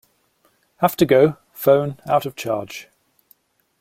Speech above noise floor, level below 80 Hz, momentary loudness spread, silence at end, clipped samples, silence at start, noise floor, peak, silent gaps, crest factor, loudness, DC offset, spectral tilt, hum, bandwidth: 45 dB; -58 dBFS; 11 LU; 1 s; under 0.1%; 0.8 s; -63 dBFS; -2 dBFS; none; 18 dB; -19 LUFS; under 0.1%; -6 dB/octave; none; 16.5 kHz